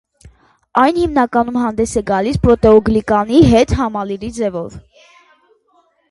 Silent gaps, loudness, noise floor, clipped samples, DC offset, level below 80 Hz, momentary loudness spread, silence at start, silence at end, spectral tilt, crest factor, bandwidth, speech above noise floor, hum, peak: none; -14 LUFS; -57 dBFS; under 0.1%; under 0.1%; -32 dBFS; 11 LU; 0.25 s; 1.3 s; -6.5 dB/octave; 14 dB; 11.5 kHz; 44 dB; none; 0 dBFS